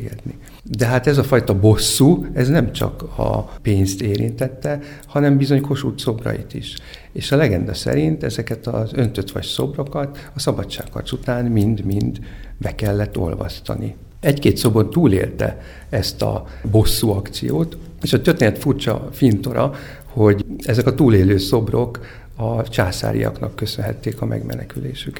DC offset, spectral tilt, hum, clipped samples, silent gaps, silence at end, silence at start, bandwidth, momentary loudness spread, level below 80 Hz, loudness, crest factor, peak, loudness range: under 0.1%; -6 dB/octave; none; under 0.1%; none; 0 s; 0 s; 19.5 kHz; 13 LU; -34 dBFS; -19 LUFS; 18 dB; 0 dBFS; 5 LU